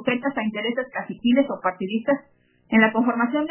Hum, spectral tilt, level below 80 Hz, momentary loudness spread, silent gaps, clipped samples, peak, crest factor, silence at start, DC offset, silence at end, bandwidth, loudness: none; -9 dB/octave; -66 dBFS; 8 LU; none; under 0.1%; -2 dBFS; 20 dB; 0 s; under 0.1%; 0 s; 3.2 kHz; -23 LUFS